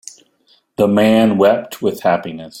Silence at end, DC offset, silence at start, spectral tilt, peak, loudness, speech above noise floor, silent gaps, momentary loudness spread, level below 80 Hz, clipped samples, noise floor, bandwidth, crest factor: 0 s; under 0.1%; 0.8 s; -6 dB/octave; 0 dBFS; -15 LUFS; 43 dB; none; 11 LU; -54 dBFS; under 0.1%; -57 dBFS; 16.5 kHz; 16 dB